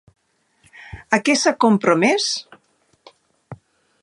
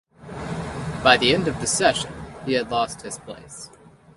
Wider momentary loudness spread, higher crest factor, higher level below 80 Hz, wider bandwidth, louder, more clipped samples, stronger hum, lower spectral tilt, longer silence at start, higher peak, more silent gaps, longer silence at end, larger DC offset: second, 15 LU vs 22 LU; about the same, 20 dB vs 24 dB; second, -56 dBFS vs -46 dBFS; about the same, 11.5 kHz vs 11.5 kHz; first, -17 LUFS vs -21 LUFS; neither; neither; about the same, -3.5 dB/octave vs -3 dB/octave; first, 0.8 s vs 0.2 s; about the same, 0 dBFS vs 0 dBFS; neither; first, 0.45 s vs 0.25 s; neither